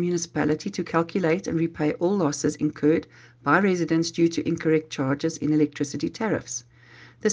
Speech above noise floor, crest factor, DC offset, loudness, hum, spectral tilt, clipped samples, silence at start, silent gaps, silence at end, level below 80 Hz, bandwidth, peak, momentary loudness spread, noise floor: 26 dB; 20 dB; under 0.1%; -25 LUFS; none; -5.5 dB/octave; under 0.1%; 0 s; none; 0 s; -62 dBFS; 9.8 kHz; -6 dBFS; 6 LU; -50 dBFS